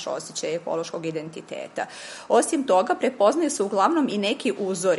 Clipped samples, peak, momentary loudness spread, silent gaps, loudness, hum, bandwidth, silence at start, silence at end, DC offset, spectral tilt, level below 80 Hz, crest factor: under 0.1%; -6 dBFS; 13 LU; none; -24 LUFS; none; 11.5 kHz; 0 s; 0 s; under 0.1%; -4 dB/octave; -74 dBFS; 18 dB